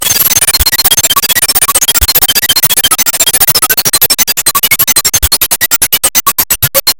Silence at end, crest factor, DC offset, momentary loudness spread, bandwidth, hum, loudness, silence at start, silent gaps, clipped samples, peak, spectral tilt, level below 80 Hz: 0.05 s; 8 dB; under 0.1%; 2 LU; over 20 kHz; none; -6 LUFS; 0 s; none; 2%; 0 dBFS; 0 dB/octave; -26 dBFS